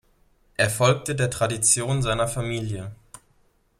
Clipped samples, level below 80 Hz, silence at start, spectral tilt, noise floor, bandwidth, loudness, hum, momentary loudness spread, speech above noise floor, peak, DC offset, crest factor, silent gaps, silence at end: under 0.1%; -46 dBFS; 0.6 s; -3.5 dB/octave; -63 dBFS; 16 kHz; -23 LUFS; none; 14 LU; 40 dB; -4 dBFS; under 0.1%; 20 dB; none; 0.65 s